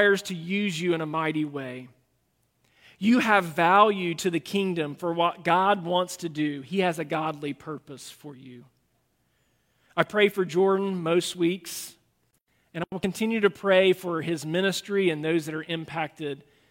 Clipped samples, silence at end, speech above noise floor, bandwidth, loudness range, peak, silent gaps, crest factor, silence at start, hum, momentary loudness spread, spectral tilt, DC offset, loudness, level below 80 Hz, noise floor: under 0.1%; 0.35 s; 46 dB; 16.5 kHz; 7 LU; -4 dBFS; none; 24 dB; 0 s; none; 15 LU; -5 dB/octave; under 0.1%; -25 LUFS; -68 dBFS; -71 dBFS